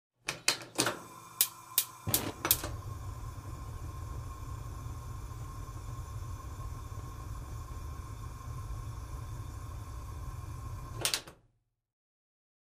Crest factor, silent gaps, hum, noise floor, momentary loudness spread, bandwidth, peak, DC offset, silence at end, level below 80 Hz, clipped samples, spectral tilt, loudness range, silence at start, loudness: 36 dB; none; none; -73 dBFS; 14 LU; 15.5 kHz; -4 dBFS; under 0.1%; 1.4 s; -46 dBFS; under 0.1%; -2.5 dB/octave; 11 LU; 0.25 s; -37 LUFS